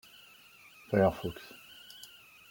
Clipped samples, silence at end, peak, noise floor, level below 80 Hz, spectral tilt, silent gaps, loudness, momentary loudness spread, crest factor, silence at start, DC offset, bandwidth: under 0.1%; 0.45 s; -12 dBFS; -57 dBFS; -62 dBFS; -6.5 dB/octave; none; -31 LUFS; 26 LU; 22 dB; 0.9 s; under 0.1%; 17 kHz